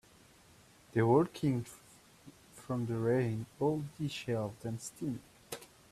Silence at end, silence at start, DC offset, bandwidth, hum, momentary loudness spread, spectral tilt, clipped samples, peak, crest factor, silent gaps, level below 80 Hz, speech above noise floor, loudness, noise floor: 0.25 s; 0.95 s; under 0.1%; 14.5 kHz; none; 19 LU; -7 dB/octave; under 0.1%; -16 dBFS; 20 dB; none; -68 dBFS; 28 dB; -34 LUFS; -62 dBFS